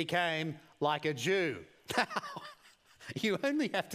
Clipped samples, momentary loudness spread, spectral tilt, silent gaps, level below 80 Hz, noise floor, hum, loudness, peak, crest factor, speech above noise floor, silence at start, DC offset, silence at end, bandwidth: under 0.1%; 14 LU; -4.5 dB/octave; none; -76 dBFS; -61 dBFS; none; -33 LUFS; -12 dBFS; 22 dB; 28 dB; 0 s; under 0.1%; 0 s; 15.5 kHz